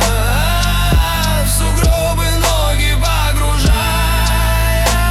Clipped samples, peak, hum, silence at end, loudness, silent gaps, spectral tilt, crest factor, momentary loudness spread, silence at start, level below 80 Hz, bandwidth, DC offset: under 0.1%; -2 dBFS; none; 0 s; -14 LUFS; none; -4 dB/octave; 10 dB; 1 LU; 0 s; -16 dBFS; 16 kHz; under 0.1%